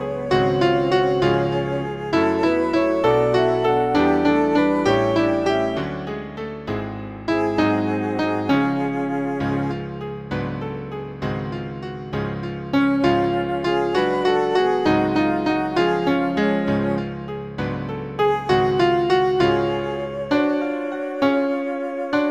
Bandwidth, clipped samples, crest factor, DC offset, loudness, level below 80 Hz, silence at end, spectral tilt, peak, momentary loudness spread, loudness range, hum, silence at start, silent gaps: 9.8 kHz; under 0.1%; 16 dB; 0.2%; -21 LUFS; -46 dBFS; 0 s; -7 dB/octave; -4 dBFS; 11 LU; 6 LU; none; 0 s; none